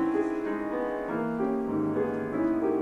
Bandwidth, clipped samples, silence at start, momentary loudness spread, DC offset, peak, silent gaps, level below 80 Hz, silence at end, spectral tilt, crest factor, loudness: 7.6 kHz; under 0.1%; 0 s; 4 LU; under 0.1%; -16 dBFS; none; -58 dBFS; 0 s; -8.5 dB/octave; 12 dB; -29 LUFS